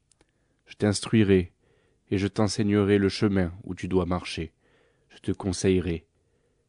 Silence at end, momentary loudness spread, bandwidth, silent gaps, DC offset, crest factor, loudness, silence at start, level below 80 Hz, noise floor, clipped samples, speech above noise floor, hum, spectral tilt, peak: 0.7 s; 14 LU; 10.5 kHz; none; under 0.1%; 18 dB; -26 LUFS; 0.7 s; -52 dBFS; -69 dBFS; under 0.1%; 44 dB; none; -6 dB/octave; -8 dBFS